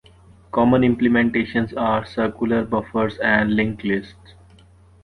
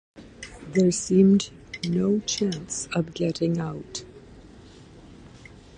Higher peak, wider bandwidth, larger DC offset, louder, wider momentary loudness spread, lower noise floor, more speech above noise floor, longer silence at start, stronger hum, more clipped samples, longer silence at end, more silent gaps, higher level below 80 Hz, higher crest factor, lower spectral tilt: first, -2 dBFS vs -8 dBFS; second, 4.9 kHz vs 10 kHz; neither; first, -20 LUFS vs -24 LUFS; second, 8 LU vs 18 LU; about the same, -50 dBFS vs -48 dBFS; first, 30 dB vs 24 dB; first, 0.55 s vs 0.15 s; neither; neither; first, 0.9 s vs 0 s; neither; first, -46 dBFS vs -54 dBFS; about the same, 18 dB vs 18 dB; first, -8 dB/octave vs -5.5 dB/octave